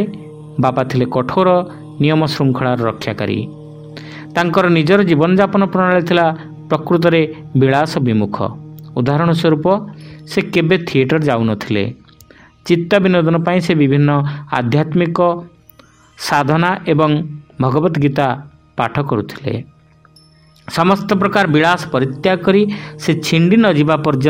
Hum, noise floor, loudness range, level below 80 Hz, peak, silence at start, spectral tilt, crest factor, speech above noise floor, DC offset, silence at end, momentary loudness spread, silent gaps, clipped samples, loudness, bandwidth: none; -47 dBFS; 4 LU; -50 dBFS; 0 dBFS; 0 s; -7 dB/octave; 14 dB; 33 dB; under 0.1%; 0 s; 12 LU; none; under 0.1%; -15 LUFS; 16 kHz